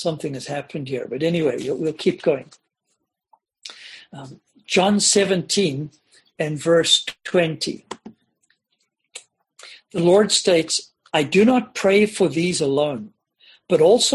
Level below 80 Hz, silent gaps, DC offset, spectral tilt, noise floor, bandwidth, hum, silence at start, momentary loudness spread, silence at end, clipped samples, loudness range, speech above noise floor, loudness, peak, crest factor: -62 dBFS; none; under 0.1%; -3.5 dB/octave; -74 dBFS; 12.5 kHz; none; 0 s; 23 LU; 0 s; under 0.1%; 7 LU; 55 dB; -19 LUFS; -4 dBFS; 18 dB